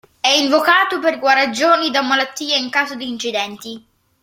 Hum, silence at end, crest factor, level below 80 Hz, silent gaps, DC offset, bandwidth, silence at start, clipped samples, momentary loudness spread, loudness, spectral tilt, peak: none; 0.45 s; 16 dB; -66 dBFS; none; under 0.1%; 16.5 kHz; 0.25 s; under 0.1%; 10 LU; -16 LUFS; -1 dB/octave; 0 dBFS